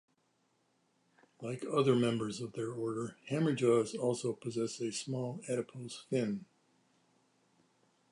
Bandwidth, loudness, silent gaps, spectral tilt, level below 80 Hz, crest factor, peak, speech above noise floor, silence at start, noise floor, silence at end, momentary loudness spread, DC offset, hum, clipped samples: 11.5 kHz; -35 LUFS; none; -6 dB/octave; -78 dBFS; 20 dB; -16 dBFS; 42 dB; 1.4 s; -76 dBFS; 1.7 s; 12 LU; under 0.1%; none; under 0.1%